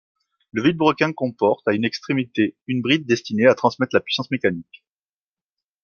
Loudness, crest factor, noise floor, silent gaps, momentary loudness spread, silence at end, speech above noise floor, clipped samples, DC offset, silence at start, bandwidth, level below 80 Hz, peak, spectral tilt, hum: -21 LUFS; 20 dB; under -90 dBFS; 2.62-2.66 s; 7 LU; 1.2 s; over 70 dB; under 0.1%; under 0.1%; 0.55 s; 7 kHz; -64 dBFS; -2 dBFS; -6 dB/octave; none